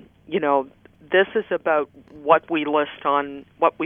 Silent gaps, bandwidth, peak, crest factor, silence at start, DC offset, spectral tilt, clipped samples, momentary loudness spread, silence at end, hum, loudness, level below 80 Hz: none; 3.7 kHz; 0 dBFS; 22 dB; 0.3 s; under 0.1%; -8 dB/octave; under 0.1%; 12 LU; 0 s; none; -22 LUFS; -64 dBFS